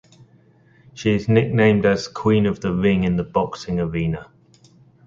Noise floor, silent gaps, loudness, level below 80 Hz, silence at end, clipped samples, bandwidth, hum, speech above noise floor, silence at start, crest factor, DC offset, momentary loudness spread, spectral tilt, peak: -54 dBFS; none; -20 LUFS; -44 dBFS; 0.85 s; under 0.1%; 7.6 kHz; none; 35 dB; 0.95 s; 18 dB; under 0.1%; 9 LU; -7 dB/octave; -2 dBFS